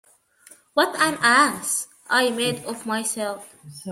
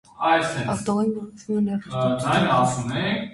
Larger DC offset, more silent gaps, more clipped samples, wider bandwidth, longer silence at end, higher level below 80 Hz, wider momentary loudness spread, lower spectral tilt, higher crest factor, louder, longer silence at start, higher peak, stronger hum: neither; neither; neither; first, 16 kHz vs 11.5 kHz; about the same, 0 s vs 0 s; second, -68 dBFS vs -54 dBFS; first, 14 LU vs 6 LU; second, -2 dB/octave vs -5.5 dB/octave; about the same, 20 dB vs 16 dB; about the same, -21 LUFS vs -23 LUFS; first, 0.75 s vs 0.2 s; first, -4 dBFS vs -8 dBFS; neither